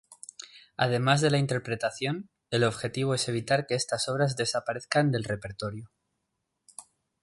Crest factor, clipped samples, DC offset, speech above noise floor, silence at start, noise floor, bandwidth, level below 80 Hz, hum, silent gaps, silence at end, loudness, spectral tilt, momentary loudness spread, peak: 20 dB; under 0.1%; under 0.1%; 53 dB; 0.1 s; -81 dBFS; 11.5 kHz; -62 dBFS; none; none; 0.4 s; -28 LUFS; -4.5 dB/octave; 20 LU; -10 dBFS